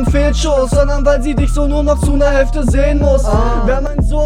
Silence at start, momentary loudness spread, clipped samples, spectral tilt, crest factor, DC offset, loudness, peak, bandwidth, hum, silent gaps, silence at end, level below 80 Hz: 0 s; 3 LU; under 0.1%; -6.5 dB/octave; 12 dB; under 0.1%; -14 LUFS; 0 dBFS; 11 kHz; none; none; 0 s; -14 dBFS